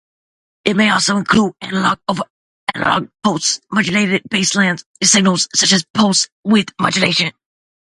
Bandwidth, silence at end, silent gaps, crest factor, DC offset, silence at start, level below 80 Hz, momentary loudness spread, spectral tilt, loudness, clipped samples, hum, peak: 11.5 kHz; 0.6 s; 2.30-2.67 s, 4.86-4.95 s, 5.90-5.94 s, 6.32-6.43 s; 16 dB; under 0.1%; 0.65 s; -52 dBFS; 8 LU; -3 dB/octave; -15 LUFS; under 0.1%; none; 0 dBFS